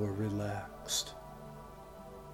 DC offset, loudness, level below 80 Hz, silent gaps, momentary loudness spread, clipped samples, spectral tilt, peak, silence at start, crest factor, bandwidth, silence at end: under 0.1%; -37 LUFS; -58 dBFS; none; 16 LU; under 0.1%; -4 dB/octave; -20 dBFS; 0 s; 18 dB; 19 kHz; 0 s